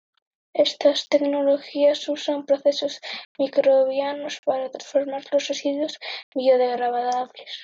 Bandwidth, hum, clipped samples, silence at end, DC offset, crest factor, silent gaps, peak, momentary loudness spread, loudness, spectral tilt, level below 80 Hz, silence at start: 7.6 kHz; none; under 0.1%; 0 s; under 0.1%; 16 dB; 3.25-3.35 s, 4.39-4.43 s, 6.23-6.32 s; -6 dBFS; 9 LU; -23 LUFS; -2.5 dB/octave; -84 dBFS; 0.55 s